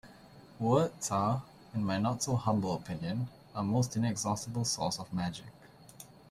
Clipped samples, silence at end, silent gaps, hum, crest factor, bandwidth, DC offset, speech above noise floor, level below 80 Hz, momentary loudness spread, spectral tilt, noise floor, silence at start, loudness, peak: under 0.1%; 0.25 s; none; none; 20 dB; 15 kHz; under 0.1%; 23 dB; -64 dBFS; 11 LU; -5.5 dB/octave; -55 dBFS; 0.05 s; -33 LUFS; -14 dBFS